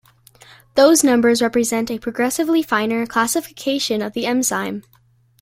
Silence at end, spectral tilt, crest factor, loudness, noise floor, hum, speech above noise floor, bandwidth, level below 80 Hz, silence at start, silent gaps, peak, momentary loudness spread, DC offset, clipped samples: 0.6 s; -3 dB/octave; 16 dB; -18 LUFS; -56 dBFS; none; 38 dB; 16.5 kHz; -56 dBFS; 0.75 s; none; -2 dBFS; 10 LU; under 0.1%; under 0.1%